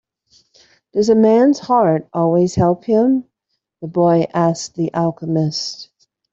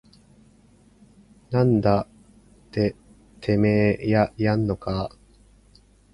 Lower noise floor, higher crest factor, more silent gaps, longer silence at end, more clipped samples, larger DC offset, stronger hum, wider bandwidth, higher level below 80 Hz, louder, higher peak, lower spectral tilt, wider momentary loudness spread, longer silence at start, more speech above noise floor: first, -74 dBFS vs -55 dBFS; second, 14 dB vs 20 dB; neither; second, 0.5 s vs 1.05 s; neither; neither; second, none vs 50 Hz at -45 dBFS; second, 7.8 kHz vs 11 kHz; second, -54 dBFS vs -48 dBFS; first, -16 LUFS vs -23 LUFS; first, -2 dBFS vs -6 dBFS; second, -6.5 dB/octave vs -9 dB/octave; about the same, 11 LU vs 12 LU; second, 0.95 s vs 1.5 s; first, 59 dB vs 34 dB